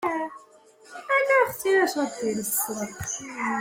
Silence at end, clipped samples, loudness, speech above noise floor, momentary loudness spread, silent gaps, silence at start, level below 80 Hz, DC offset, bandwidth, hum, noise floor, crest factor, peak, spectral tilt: 0 s; under 0.1%; -25 LUFS; 27 dB; 11 LU; none; 0 s; -62 dBFS; under 0.1%; 16.5 kHz; none; -53 dBFS; 18 dB; -8 dBFS; -3 dB/octave